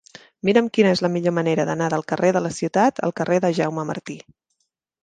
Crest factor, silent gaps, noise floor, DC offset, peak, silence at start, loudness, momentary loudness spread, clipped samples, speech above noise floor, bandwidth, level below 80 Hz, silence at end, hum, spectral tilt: 18 dB; none; -74 dBFS; under 0.1%; -2 dBFS; 0.45 s; -21 LUFS; 10 LU; under 0.1%; 54 dB; 9.6 kHz; -64 dBFS; 0.85 s; none; -6 dB/octave